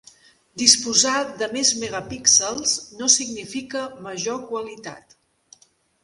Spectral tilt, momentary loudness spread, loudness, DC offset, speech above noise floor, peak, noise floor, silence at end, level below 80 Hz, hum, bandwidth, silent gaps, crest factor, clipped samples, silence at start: -0.5 dB/octave; 16 LU; -19 LUFS; under 0.1%; 36 dB; 0 dBFS; -59 dBFS; 1.05 s; -60 dBFS; none; 16 kHz; none; 24 dB; under 0.1%; 0.55 s